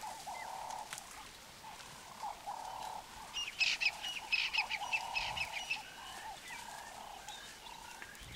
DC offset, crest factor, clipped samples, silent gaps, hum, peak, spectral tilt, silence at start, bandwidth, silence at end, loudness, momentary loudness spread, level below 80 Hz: under 0.1%; 22 dB; under 0.1%; none; none; -20 dBFS; 0 dB/octave; 0 s; 16 kHz; 0 s; -39 LUFS; 17 LU; -66 dBFS